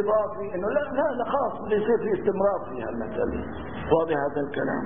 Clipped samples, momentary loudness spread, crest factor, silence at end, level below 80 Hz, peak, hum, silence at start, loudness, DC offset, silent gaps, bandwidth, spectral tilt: under 0.1%; 8 LU; 20 dB; 0 s; -48 dBFS; -6 dBFS; none; 0 s; -26 LUFS; 0.8%; none; 3.7 kHz; -11 dB/octave